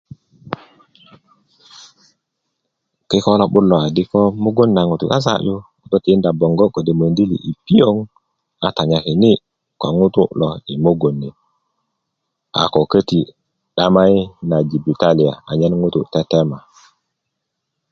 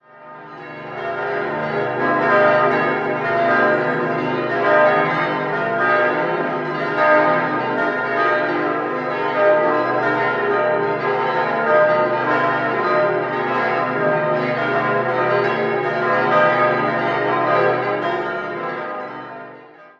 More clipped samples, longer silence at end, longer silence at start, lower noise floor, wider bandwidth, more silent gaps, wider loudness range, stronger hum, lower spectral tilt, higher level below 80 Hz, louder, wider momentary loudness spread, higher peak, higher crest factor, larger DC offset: neither; first, 1.35 s vs 0.15 s; first, 0.45 s vs 0.15 s; first, -76 dBFS vs -41 dBFS; about the same, 7.4 kHz vs 7 kHz; neither; about the same, 4 LU vs 2 LU; second, none vs 50 Hz at -60 dBFS; about the same, -7.5 dB/octave vs -7 dB/octave; first, -48 dBFS vs -66 dBFS; about the same, -16 LUFS vs -18 LUFS; about the same, 10 LU vs 10 LU; about the same, 0 dBFS vs -2 dBFS; about the same, 16 dB vs 16 dB; neither